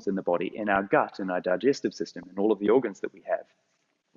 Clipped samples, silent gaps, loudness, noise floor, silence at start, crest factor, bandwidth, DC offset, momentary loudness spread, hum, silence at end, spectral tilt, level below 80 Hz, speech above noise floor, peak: under 0.1%; none; -27 LUFS; -74 dBFS; 0 s; 20 dB; 7.4 kHz; under 0.1%; 10 LU; none; 0.75 s; -6 dB/octave; -68 dBFS; 47 dB; -8 dBFS